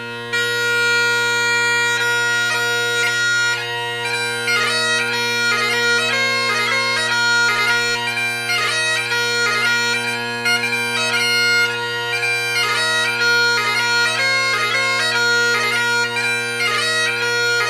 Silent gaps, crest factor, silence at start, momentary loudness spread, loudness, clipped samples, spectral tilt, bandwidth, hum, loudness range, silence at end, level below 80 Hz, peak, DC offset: none; 14 dB; 0 s; 4 LU; -16 LUFS; under 0.1%; -1 dB/octave; 15.5 kHz; none; 2 LU; 0 s; -68 dBFS; -4 dBFS; under 0.1%